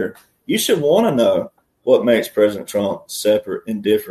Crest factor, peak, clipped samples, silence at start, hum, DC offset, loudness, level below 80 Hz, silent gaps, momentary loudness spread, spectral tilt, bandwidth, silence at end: 16 dB; -2 dBFS; under 0.1%; 0 s; none; under 0.1%; -18 LUFS; -60 dBFS; none; 10 LU; -4.5 dB/octave; 13.5 kHz; 0 s